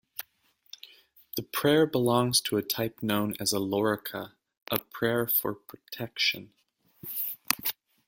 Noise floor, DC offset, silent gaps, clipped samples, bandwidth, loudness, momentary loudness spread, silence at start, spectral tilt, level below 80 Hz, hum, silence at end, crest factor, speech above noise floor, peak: -67 dBFS; under 0.1%; none; under 0.1%; 17 kHz; -28 LUFS; 18 LU; 0.2 s; -4 dB/octave; -66 dBFS; none; 0.35 s; 30 dB; 39 dB; 0 dBFS